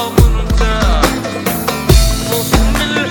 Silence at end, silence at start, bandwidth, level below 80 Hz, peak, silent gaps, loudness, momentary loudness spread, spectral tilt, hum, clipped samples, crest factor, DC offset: 0 s; 0 s; over 20 kHz; -14 dBFS; 0 dBFS; none; -13 LUFS; 5 LU; -4.5 dB/octave; none; 0.2%; 12 dB; under 0.1%